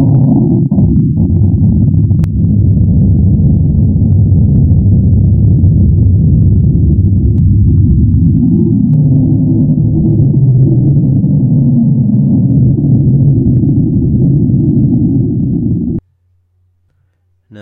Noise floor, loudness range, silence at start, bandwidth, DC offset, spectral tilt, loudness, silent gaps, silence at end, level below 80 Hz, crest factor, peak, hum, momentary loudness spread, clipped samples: -56 dBFS; 2 LU; 0 s; 1.1 kHz; under 0.1%; -14.5 dB/octave; -9 LUFS; none; 0 s; -18 dBFS; 8 dB; 0 dBFS; none; 2 LU; 0.1%